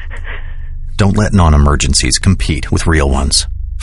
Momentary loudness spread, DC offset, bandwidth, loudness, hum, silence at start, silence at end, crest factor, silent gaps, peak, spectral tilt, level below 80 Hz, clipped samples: 17 LU; under 0.1%; 11.5 kHz; -12 LUFS; none; 0 s; 0 s; 12 dB; none; 0 dBFS; -4.5 dB/octave; -16 dBFS; under 0.1%